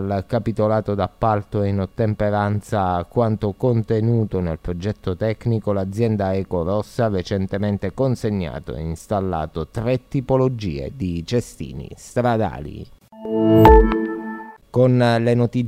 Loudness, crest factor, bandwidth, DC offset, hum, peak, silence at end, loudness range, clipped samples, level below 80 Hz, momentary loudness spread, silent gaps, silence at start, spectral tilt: -20 LUFS; 20 dB; 15 kHz; under 0.1%; none; 0 dBFS; 0 s; 6 LU; under 0.1%; -32 dBFS; 11 LU; none; 0 s; -8 dB/octave